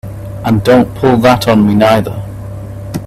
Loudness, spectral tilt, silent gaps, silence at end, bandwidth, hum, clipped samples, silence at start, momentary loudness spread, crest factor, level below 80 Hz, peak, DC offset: -10 LUFS; -7 dB/octave; none; 0 s; 14.5 kHz; none; under 0.1%; 0.05 s; 17 LU; 10 dB; -34 dBFS; 0 dBFS; under 0.1%